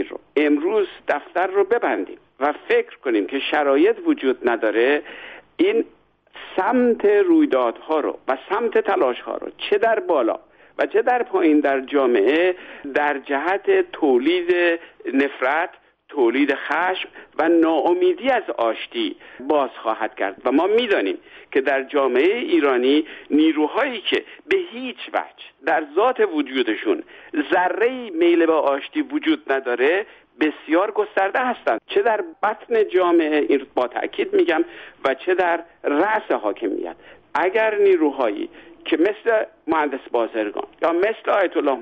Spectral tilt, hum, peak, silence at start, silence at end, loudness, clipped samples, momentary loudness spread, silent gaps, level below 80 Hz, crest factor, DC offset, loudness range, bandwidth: -5.5 dB/octave; none; -6 dBFS; 0 s; 0 s; -20 LUFS; under 0.1%; 9 LU; none; -66 dBFS; 14 dB; under 0.1%; 2 LU; 5.6 kHz